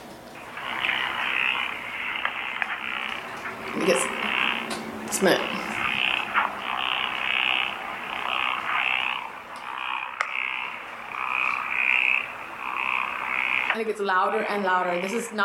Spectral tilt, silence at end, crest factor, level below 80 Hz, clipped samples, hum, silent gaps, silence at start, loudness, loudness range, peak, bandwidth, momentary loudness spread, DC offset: -2.5 dB/octave; 0 s; 20 dB; -64 dBFS; under 0.1%; none; none; 0 s; -25 LUFS; 3 LU; -6 dBFS; 17 kHz; 10 LU; under 0.1%